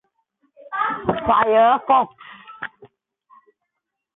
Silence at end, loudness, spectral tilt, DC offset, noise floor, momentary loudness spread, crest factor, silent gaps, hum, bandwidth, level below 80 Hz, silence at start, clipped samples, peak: 1.3 s; -18 LUFS; -9.5 dB/octave; under 0.1%; -80 dBFS; 19 LU; 18 dB; none; none; 4 kHz; -52 dBFS; 0.65 s; under 0.1%; -4 dBFS